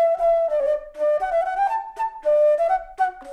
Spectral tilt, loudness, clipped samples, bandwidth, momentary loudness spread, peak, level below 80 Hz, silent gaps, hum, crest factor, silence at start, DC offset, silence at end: -3.5 dB/octave; -21 LUFS; under 0.1%; 10.5 kHz; 7 LU; -10 dBFS; -52 dBFS; none; none; 10 dB; 0 s; under 0.1%; 0 s